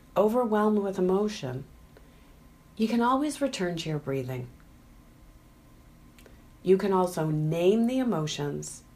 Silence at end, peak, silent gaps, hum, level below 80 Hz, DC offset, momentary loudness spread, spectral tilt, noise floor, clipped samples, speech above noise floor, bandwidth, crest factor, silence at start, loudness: 0.15 s; -10 dBFS; none; none; -56 dBFS; under 0.1%; 12 LU; -6 dB/octave; -54 dBFS; under 0.1%; 28 dB; 15.5 kHz; 18 dB; 0.15 s; -27 LUFS